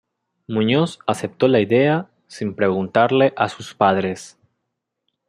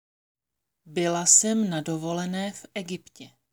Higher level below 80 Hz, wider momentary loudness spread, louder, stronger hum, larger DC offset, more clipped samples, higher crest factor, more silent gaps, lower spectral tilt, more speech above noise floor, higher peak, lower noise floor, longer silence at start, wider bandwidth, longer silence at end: first, -64 dBFS vs -74 dBFS; second, 11 LU vs 19 LU; first, -19 LUFS vs -23 LUFS; neither; neither; neither; second, 18 dB vs 24 dB; neither; first, -6 dB/octave vs -3 dB/octave; about the same, 60 dB vs 59 dB; about the same, -2 dBFS vs -4 dBFS; second, -78 dBFS vs -85 dBFS; second, 0.5 s vs 0.85 s; second, 12 kHz vs over 20 kHz; first, 1 s vs 0.25 s